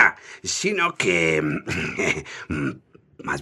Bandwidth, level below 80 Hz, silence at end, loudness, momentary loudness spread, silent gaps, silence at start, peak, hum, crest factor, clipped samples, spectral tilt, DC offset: 13.5 kHz; -52 dBFS; 0 s; -23 LUFS; 12 LU; none; 0 s; -2 dBFS; none; 22 dB; under 0.1%; -3.5 dB/octave; under 0.1%